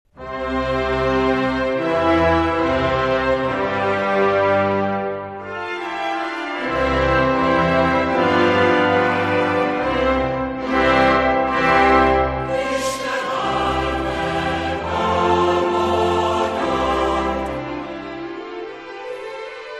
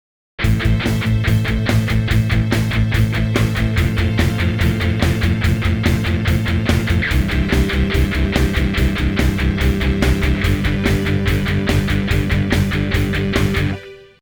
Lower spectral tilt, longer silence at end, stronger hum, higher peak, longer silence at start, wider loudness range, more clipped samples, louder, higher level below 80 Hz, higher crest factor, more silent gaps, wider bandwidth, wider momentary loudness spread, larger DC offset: about the same, -5.5 dB/octave vs -6.5 dB/octave; second, 0 s vs 0.2 s; neither; about the same, -2 dBFS vs 0 dBFS; second, 0.15 s vs 0.4 s; first, 4 LU vs 0 LU; neither; about the same, -19 LUFS vs -17 LUFS; second, -36 dBFS vs -22 dBFS; about the same, 18 dB vs 16 dB; neither; second, 13 kHz vs over 20 kHz; first, 13 LU vs 1 LU; neither